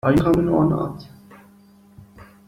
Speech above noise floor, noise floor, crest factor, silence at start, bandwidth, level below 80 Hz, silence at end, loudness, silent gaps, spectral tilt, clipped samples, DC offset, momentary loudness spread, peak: 32 dB; -51 dBFS; 18 dB; 0.05 s; 15.5 kHz; -42 dBFS; 0.25 s; -19 LUFS; none; -8.5 dB/octave; under 0.1%; under 0.1%; 14 LU; -4 dBFS